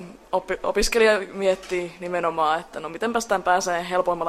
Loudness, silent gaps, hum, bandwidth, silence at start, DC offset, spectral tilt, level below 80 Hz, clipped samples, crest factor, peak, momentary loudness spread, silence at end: -23 LUFS; none; none; 15 kHz; 0 s; under 0.1%; -3 dB/octave; -44 dBFS; under 0.1%; 18 dB; -6 dBFS; 10 LU; 0 s